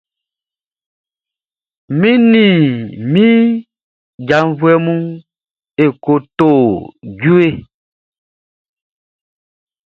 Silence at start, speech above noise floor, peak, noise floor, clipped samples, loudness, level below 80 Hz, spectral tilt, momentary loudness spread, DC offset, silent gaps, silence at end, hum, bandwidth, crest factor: 1.9 s; over 79 dB; 0 dBFS; under -90 dBFS; under 0.1%; -12 LUFS; -52 dBFS; -8.5 dB/octave; 15 LU; under 0.1%; 3.83-4.18 s; 2.3 s; none; 7 kHz; 14 dB